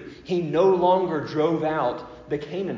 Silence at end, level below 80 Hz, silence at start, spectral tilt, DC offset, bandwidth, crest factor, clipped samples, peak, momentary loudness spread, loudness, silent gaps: 0 s; -58 dBFS; 0 s; -7.5 dB/octave; under 0.1%; 7.4 kHz; 16 dB; under 0.1%; -8 dBFS; 12 LU; -23 LUFS; none